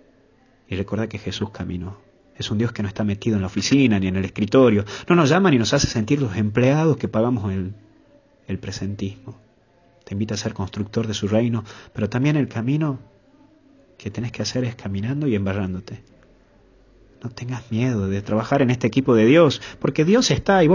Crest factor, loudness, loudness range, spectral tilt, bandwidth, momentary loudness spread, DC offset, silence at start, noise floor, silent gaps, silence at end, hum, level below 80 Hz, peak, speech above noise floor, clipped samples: 18 dB; -21 LUFS; 9 LU; -6 dB/octave; 7.4 kHz; 15 LU; under 0.1%; 0.7 s; -57 dBFS; none; 0 s; none; -44 dBFS; -4 dBFS; 37 dB; under 0.1%